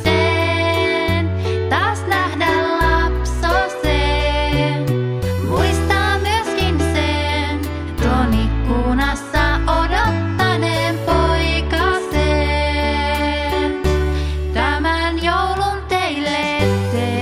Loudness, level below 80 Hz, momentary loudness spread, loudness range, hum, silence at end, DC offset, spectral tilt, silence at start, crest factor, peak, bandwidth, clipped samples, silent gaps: -18 LUFS; -24 dBFS; 3 LU; 1 LU; none; 0 s; under 0.1%; -5.5 dB/octave; 0 s; 14 dB; -2 dBFS; 15.5 kHz; under 0.1%; none